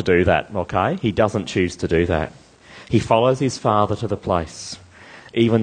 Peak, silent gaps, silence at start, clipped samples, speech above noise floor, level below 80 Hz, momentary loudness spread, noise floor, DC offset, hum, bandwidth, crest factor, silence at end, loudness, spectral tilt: -2 dBFS; none; 0 s; under 0.1%; 25 dB; -42 dBFS; 12 LU; -44 dBFS; under 0.1%; none; 9.8 kHz; 18 dB; 0 s; -20 LUFS; -6 dB/octave